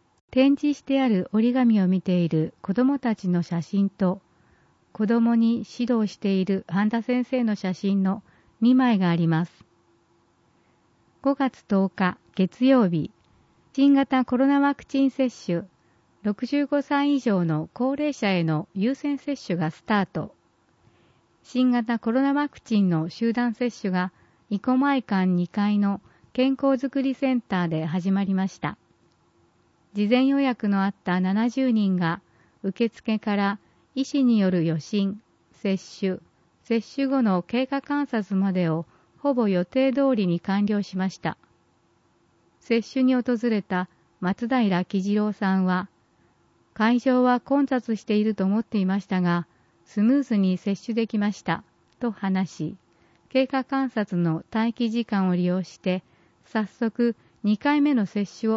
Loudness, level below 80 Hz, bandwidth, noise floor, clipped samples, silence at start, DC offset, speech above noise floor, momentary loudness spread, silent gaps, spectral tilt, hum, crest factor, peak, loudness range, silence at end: -24 LUFS; -66 dBFS; 7.6 kHz; -64 dBFS; under 0.1%; 0.3 s; under 0.1%; 41 dB; 9 LU; none; -7.5 dB/octave; none; 16 dB; -8 dBFS; 4 LU; 0 s